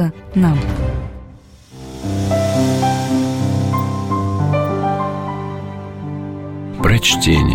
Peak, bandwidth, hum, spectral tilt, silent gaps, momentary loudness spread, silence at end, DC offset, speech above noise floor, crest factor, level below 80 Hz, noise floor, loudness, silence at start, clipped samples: -2 dBFS; 16.5 kHz; none; -5.5 dB/octave; none; 15 LU; 0 s; under 0.1%; 26 dB; 14 dB; -30 dBFS; -40 dBFS; -18 LUFS; 0 s; under 0.1%